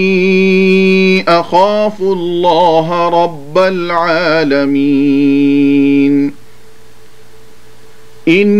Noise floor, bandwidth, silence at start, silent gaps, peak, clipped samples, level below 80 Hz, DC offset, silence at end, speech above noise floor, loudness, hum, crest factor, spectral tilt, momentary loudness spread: -43 dBFS; 9.2 kHz; 0 s; none; 0 dBFS; under 0.1%; -56 dBFS; 4%; 0 s; 33 dB; -10 LUFS; none; 12 dB; -7 dB/octave; 5 LU